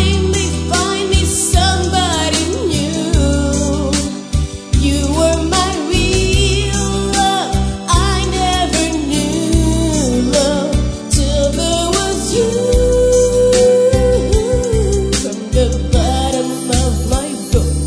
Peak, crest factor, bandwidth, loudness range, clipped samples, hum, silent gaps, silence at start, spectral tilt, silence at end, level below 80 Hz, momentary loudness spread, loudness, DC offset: 0 dBFS; 14 dB; 11 kHz; 3 LU; under 0.1%; none; none; 0 s; -4.5 dB/octave; 0 s; -20 dBFS; 5 LU; -14 LUFS; under 0.1%